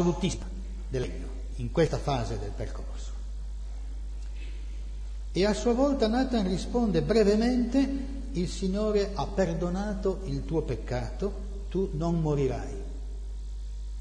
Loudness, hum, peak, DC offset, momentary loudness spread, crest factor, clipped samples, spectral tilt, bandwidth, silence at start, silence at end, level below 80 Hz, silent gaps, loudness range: -30 LUFS; none; -12 dBFS; under 0.1%; 15 LU; 16 dB; under 0.1%; -6.5 dB/octave; 10.5 kHz; 0 s; 0 s; -36 dBFS; none; 7 LU